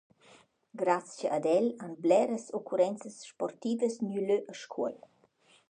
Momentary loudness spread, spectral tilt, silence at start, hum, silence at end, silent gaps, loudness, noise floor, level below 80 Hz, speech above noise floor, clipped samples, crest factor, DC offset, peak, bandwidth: 13 LU; -5.5 dB/octave; 0.75 s; none; 0.75 s; none; -31 LUFS; -66 dBFS; -86 dBFS; 35 dB; under 0.1%; 20 dB; under 0.1%; -12 dBFS; 9.8 kHz